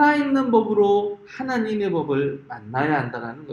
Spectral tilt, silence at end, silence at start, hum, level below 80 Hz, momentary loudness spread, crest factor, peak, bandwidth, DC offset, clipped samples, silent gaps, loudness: -7.5 dB/octave; 0 s; 0 s; none; -62 dBFS; 12 LU; 16 dB; -6 dBFS; 7.2 kHz; under 0.1%; under 0.1%; none; -22 LUFS